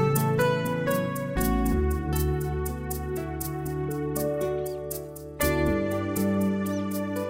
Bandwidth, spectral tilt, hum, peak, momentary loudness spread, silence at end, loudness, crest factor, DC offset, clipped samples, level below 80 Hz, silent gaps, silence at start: 16 kHz; -6 dB/octave; none; -10 dBFS; 8 LU; 0 s; -28 LUFS; 16 dB; under 0.1%; under 0.1%; -36 dBFS; none; 0 s